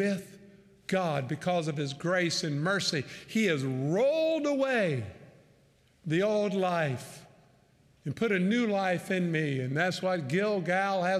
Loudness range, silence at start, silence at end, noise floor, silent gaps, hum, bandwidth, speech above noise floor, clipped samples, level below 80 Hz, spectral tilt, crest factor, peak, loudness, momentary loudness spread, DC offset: 3 LU; 0 s; 0 s; -64 dBFS; none; none; 14.5 kHz; 35 dB; under 0.1%; -72 dBFS; -5.5 dB/octave; 14 dB; -16 dBFS; -29 LUFS; 8 LU; under 0.1%